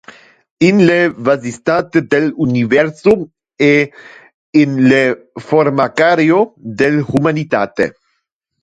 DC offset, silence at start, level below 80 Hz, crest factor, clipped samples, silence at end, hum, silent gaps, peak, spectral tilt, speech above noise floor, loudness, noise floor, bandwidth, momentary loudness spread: under 0.1%; 0.6 s; -52 dBFS; 14 dB; under 0.1%; 0.7 s; none; 4.34-4.53 s; 0 dBFS; -7 dB/octave; 57 dB; -13 LUFS; -70 dBFS; 9.2 kHz; 7 LU